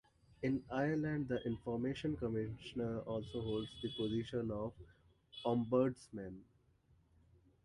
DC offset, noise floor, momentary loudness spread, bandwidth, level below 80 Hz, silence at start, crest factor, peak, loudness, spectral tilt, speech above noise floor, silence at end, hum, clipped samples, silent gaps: under 0.1%; -72 dBFS; 12 LU; 11.5 kHz; -62 dBFS; 0.4 s; 18 dB; -22 dBFS; -40 LUFS; -7.5 dB/octave; 32 dB; 1.2 s; none; under 0.1%; none